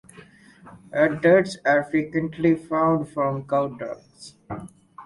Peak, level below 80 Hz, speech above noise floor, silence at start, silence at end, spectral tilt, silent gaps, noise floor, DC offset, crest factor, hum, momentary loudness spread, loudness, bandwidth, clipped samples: -4 dBFS; -58 dBFS; 27 dB; 0.65 s; 0 s; -7 dB/octave; none; -49 dBFS; under 0.1%; 18 dB; none; 19 LU; -22 LUFS; 11.5 kHz; under 0.1%